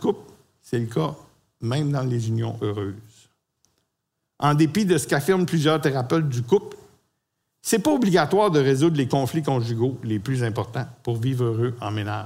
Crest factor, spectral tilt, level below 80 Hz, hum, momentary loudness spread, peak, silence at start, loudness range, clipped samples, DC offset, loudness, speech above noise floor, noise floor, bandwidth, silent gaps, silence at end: 16 dB; -6 dB/octave; -62 dBFS; none; 11 LU; -6 dBFS; 0 s; 6 LU; under 0.1%; under 0.1%; -23 LUFS; 57 dB; -79 dBFS; 16 kHz; none; 0 s